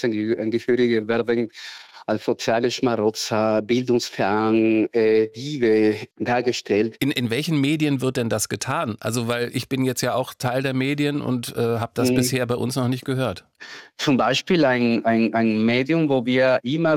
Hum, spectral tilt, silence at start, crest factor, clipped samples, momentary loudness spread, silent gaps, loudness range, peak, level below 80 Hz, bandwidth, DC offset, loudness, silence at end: none; -5.5 dB/octave; 0 s; 14 dB; under 0.1%; 7 LU; none; 3 LU; -8 dBFS; -62 dBFS; 17 kHz; under 0.1%; -21 LUFS; 0 s